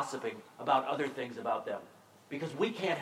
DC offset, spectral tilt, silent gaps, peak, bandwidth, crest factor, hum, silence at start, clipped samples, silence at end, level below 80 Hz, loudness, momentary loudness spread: under 0.1%; -5 dB/octave; none; -16 dBFS; 16 kHz; 20 dB; none; 0 s; under 0.1%; 0 s; -88 dBFS; -35 LUFS; 11 LU